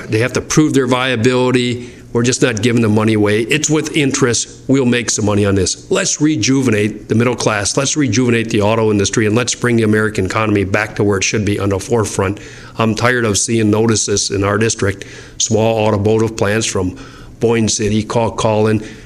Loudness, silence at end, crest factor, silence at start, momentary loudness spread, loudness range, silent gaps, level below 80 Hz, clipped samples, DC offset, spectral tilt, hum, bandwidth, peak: -14 LUFS; 0 s; 14 dB; 0 s; 5 LU; 2 LU; none; -42 dBFS; under 0.1%; under 0.1%; -4.5 dB/octave; none; 13.5 kHz; 0 dBFS